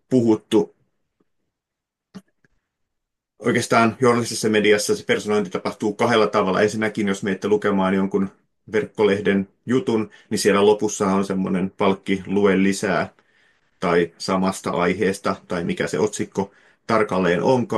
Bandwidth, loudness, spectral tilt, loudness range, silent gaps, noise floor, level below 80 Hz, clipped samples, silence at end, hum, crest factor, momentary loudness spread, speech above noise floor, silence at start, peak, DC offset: 12.5 kHz; -21 LUFS; -5 dB/octave; 4 LU; none; -84 dBFS; -64 dBFS; under 0.1%; 0 s; none; 18 dB; 8 LU; 64 dB; 0.1 s; -4 dBFS; under 0.1%